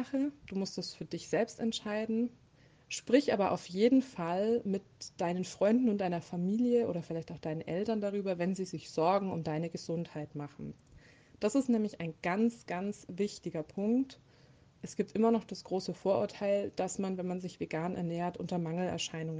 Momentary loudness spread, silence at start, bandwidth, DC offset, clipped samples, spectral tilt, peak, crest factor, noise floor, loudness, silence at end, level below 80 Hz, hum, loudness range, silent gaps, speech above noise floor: 11 LU; 0 s; 9.8 kHz; under 0.1%; under 0.1%; -6 dB/octave; -12 dBFS; 20 dB; -62 dBFS; -34 LUFS; 0 s; -70 dBFS; none; 4 LU; none; 29 dB